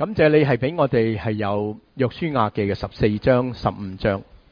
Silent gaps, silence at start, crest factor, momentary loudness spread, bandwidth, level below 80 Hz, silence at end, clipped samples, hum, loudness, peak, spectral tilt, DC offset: none; 0 s; 18 dB; 9 LU; 5.2 kHz; -44 dBFS; 0.15 s; under 0.1%; none; -21 LUFS; -4 dBFS; -9 dB/octave; under 0.1%